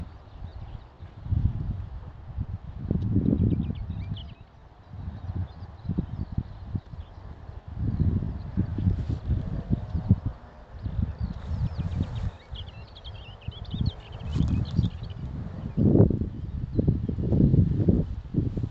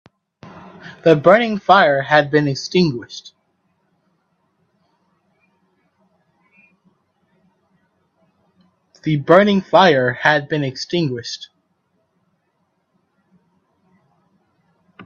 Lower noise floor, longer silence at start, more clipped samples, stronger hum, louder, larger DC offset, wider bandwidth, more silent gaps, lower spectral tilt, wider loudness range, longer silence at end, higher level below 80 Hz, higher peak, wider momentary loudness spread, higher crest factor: second, -50 dBFS vs -68 dBFS; second, 0 s vs 0.45 s; neither; neither; second, -29 LUFS vs -15 LUFS; neither; second, 5.8 kHz vs 7.6 kHz; neither; first, -10 dB/octave vs -6 dB/octave; second, 9 LU vs 13 LU; about the same, 0 s vs 0.05 s; first, -36 dBFS vs -62 dBFS; second, -4 dBFS vs 0 dBFS; about the same, 20 LU vs 21 LU; about the same, 24 dB vs 20 dB